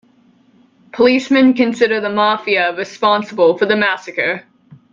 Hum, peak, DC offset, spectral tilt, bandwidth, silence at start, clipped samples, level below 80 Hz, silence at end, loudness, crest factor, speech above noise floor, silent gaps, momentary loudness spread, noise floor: none; 0 dBFS; under 0.1%; -5 dB/octave; 7.4 kHz; 0.95 s; under 0.1%; -60 dBFS; 0.2 s; -14 LUFS; 14 dB; 38 dB; none; 7 LU; -52 dBFS